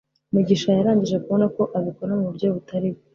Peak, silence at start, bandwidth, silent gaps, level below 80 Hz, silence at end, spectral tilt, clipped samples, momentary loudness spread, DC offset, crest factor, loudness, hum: -6 dBFS; 0.35 s; 7.2 kHz; none; -60 dBFS; 0.2 s; -7.5 dB/octave; under 0.1%; 7 LU; under 0.1%; 16 dB; -22 LUFS; none